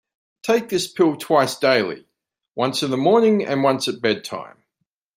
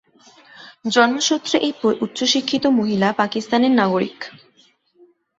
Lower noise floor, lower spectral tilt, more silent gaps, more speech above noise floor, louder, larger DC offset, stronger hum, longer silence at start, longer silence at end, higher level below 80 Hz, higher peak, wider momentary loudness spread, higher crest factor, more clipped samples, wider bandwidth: first, -77 dBFS vs -57 dBFS; about the same, -4.5 dB/octave vs -3.5 dB/octave; neither; first, 58 dB vs 39 dB; about the same, -19 LUFS vs -18 LUFS; neither; neither; second, 0.45 s vs 0.6 s; second, 0.7 s vs 1.1 s; about the same, -68 dBFS vs -64 dBFS; about the same, -2 dBFS vs -2 dBFS; first, 14 LU vs 8 LU; about the same, 18 dB vs 18 dB; neither; first, 16 kHz vs 8 kHz